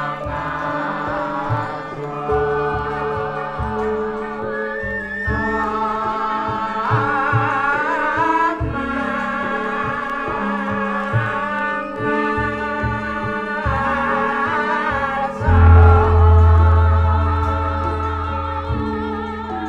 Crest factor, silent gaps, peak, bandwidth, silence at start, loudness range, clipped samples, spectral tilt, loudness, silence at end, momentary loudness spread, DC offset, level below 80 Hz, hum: 18 dB; none; 0 dBFS; 5.6 kHz; 0 s; 8 LU; under 0.1%; -8 dB/octave; -19 LUFS; 0 s; 11 LU; under 0.1%; -26 dBFS; none